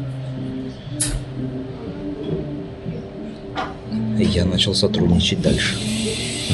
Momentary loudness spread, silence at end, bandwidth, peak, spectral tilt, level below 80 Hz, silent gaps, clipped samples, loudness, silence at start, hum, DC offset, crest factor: 13 LU; 0 s; 12 kHz; -4 dBFS; -4.5 dB/octave; -36 dBFS; none; under 0.1%; -22 LUFS; 0 s; none; under 0.1%; 18 dB